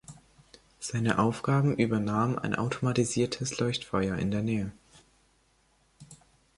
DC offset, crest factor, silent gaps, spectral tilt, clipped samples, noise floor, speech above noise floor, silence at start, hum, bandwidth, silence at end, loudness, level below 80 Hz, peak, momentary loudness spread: under 0.1%; 20 dB; none; -5.5 dB/octave; under 0.1%; -67 dBFS; 39 dB; 0.1 s; none; 11.5 kHz; 0.4 s; -29 LUFS; -56 dBFS; -10 dBFS; 5 LU